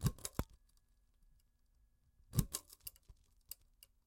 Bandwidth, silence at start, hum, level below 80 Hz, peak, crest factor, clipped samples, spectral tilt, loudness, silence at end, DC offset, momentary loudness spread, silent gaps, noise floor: 17 kHz; 0 s; none; -54 dBFS; -16 dBFS; 30 dB; under 0.1%; -5 dB/octave; -45 LUFS; 0.95 s; under 0.1%; 15 LU; none; -73 dBFS